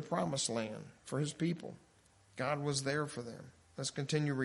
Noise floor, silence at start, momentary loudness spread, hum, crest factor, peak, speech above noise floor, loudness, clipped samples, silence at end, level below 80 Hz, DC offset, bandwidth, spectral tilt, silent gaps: -67 dBFS; 0 s; 16 LU; none; 18 dB; -20 dBFS; 29 dB; -38 LUFS; under 0.1%; 0 s; -74 dBFS; under 0.1%; 11.5 kHz; -4.5 dB/octave; none